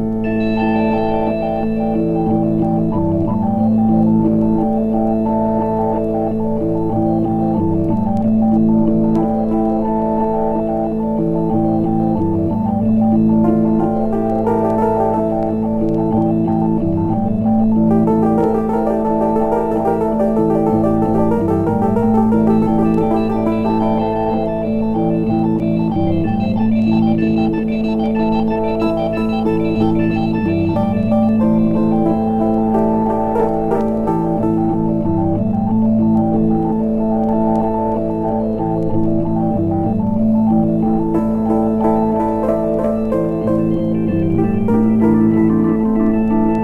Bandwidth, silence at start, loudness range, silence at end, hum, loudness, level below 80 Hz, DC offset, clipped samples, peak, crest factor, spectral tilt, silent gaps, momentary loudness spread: 4.2 kHz; 0 s; 2 LU; 0 s; none; -16 LUFS; -34 dBFS; under 0.1%; under 0.1%; -2 dBFS; 14 dB; -10.5 dB/octave; none; 4 LU